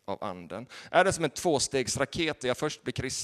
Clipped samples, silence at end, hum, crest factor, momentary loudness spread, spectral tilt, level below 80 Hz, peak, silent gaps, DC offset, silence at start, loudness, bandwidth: under 0.1%; 0 s; none; 22 dB; 13 LU; -3.5 dB/octave; -56 dBFS; -6 dBFS; none; under 0.1%; 0.1 s; -29 LUFS; 13.5 kHz